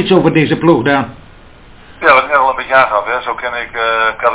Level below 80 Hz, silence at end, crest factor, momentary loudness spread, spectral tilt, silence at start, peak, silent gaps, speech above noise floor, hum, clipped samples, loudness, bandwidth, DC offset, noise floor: -44 dBFS; 0 s; 12 dB; 9 LU; -9.5 dB/octave; 0 s; 0 dBFS; none; 26 dB; none; 0.3%; -12 LUFS; 4 kHz; under 0.1%; -38 dBFS